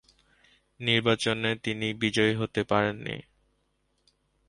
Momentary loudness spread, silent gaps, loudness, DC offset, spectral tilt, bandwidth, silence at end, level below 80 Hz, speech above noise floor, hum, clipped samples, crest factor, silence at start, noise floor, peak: 10 LU; none; -27 LUFS; under 0.1%; -5 dB/octave; 11.5 kHz; 1.3 s; -60 dBFS; 46 dB; 50 Hz at -60 dBFS; under 0.1%; 20 dB; 0.8 s; -73 dBFS; -10 dBFS